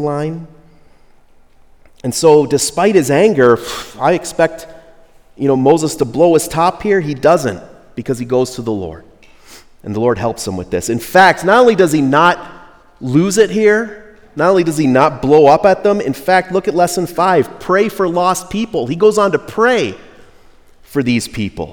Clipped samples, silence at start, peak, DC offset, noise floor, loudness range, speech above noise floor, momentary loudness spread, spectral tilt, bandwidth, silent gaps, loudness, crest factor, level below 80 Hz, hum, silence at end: 0.2%; 0 s; 0 dBFS; under 0.1%; -45 dBFS; 4 LU; 32 dB; 13 LU; -5 dB/octave; over 20 kHz; none; -13 LUFS; 14 dB; -46 dBFS; none; 0 s